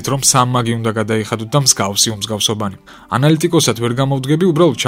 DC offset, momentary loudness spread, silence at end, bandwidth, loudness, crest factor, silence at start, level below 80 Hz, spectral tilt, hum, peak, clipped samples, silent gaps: under 0.1%; 6 LU; 0 s; 16.5 kHz; -14 LUFS; 14 dB; 0 s; -48 dBFS; -4 dB/octave; none; 0 dBFS; under 0.1%; none